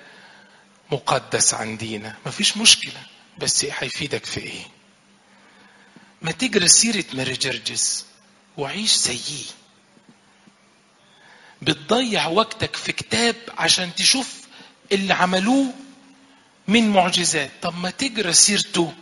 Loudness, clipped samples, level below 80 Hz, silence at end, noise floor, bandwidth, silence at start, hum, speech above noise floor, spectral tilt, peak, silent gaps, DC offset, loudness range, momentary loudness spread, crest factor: -19 LUFS; under 0.1%; -60 dBFS; 0.05 s; -56 dBFS; 11.5 kHz; 0.9 s; none; 35 dB; -2 dB/octave; 0 dBFS; none; under 0.1%; 6 LU; 16 LU; 22 dB